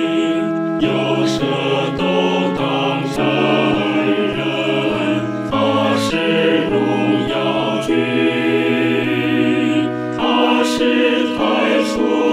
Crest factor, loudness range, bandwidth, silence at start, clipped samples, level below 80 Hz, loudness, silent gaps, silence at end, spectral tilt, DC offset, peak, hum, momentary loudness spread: 14 dB; 1 LU; 14 kHz; 0 s; under 0.1%; -48 dBFS; -16 LUFS; none; 0 s; -5.5 dB/octave; under 0.1%; -2 dBFS; none; 3 LU